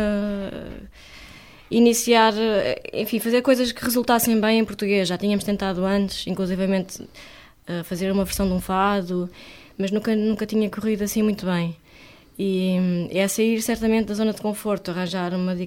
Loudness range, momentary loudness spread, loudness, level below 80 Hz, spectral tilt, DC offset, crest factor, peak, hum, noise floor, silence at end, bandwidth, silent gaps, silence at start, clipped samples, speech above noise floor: 5 LU; 15 LU; -22 LUFS; -46 dBFS; -5 dB/octave; under 0.1%; 18 dB; -4 dBFS; none; -48 dBFS; 0 s; 17 kHz; none; 0 s; under 0.1%; 27 dB